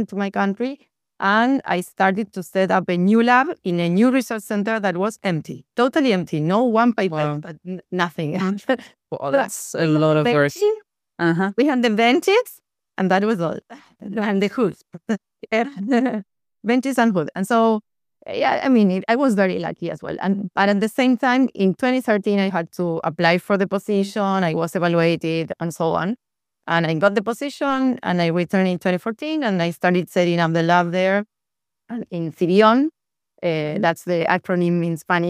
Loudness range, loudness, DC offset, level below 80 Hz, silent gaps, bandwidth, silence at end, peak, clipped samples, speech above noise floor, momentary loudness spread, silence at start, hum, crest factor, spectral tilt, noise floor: 3 LU; -20 LUFS; under 0.1%; -66 dBFS; none; 15.5 kHz; 0 s; -2 dBFS; under 0.1%; 67 dB; 10 LU; 0 s; none; 18 dB; -6 dB/octave; -86 dBFS